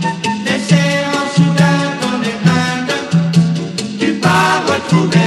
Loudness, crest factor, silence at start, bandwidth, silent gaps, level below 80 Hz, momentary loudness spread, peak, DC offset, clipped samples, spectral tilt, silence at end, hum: -14 LUFS; 14 dB; 0 s; 12.5 kHz; none; -56 dBFS; 6 LU; 0 dBFS; under 0.1%; under 0.1%; -5.5 dB/octave; 0 s; none